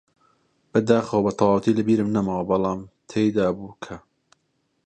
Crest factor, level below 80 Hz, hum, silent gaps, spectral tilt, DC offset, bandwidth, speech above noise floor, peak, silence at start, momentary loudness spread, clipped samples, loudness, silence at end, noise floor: 20 dB; -54 dBFS; none; none; -7.5 dB/octave; under 0.1%; 9.2 kHz; 50 dB; -4 dBFS; 0.75 s; 15 LU; under 0.1%; -22 LUFS; 0.9 s; -71 dBFS